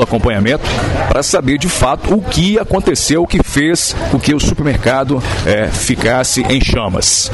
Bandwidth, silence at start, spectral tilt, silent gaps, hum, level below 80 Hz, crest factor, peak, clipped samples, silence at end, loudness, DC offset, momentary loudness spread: 12 kHz; 0 s; -4 dB/octave; none; none; -24 dBFS; 12 dB; 0 dBFS; under 0.1%; 0 s; -13 LUFS; 0.6%; 3 LU